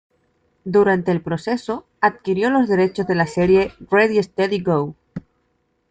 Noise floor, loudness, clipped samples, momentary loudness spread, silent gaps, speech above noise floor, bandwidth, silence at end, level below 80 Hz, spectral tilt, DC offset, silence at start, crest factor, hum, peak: -67 dBFS; -19 LUFS; under 0.1%; 13 LU; none; 49 dB; 9 kHz; 0.7 s; -52 dBFS; -7 dB/octave; under 0.1%; 0.65 s; 16 dB; none; -2 dBFS